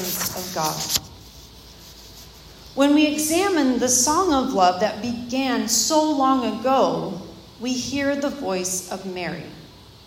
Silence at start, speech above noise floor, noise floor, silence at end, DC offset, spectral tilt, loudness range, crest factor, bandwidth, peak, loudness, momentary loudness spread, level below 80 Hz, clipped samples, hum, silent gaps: 0 s; 23 dB; -44 dBFS; 0.15 s; under 0.1%; -3 dB/octave; 5 LU; 20 dB; 16.5 kHz; -2 dBFS; -21 LUFS; 18 LU; -52 dBFS; under 0.1%; none; none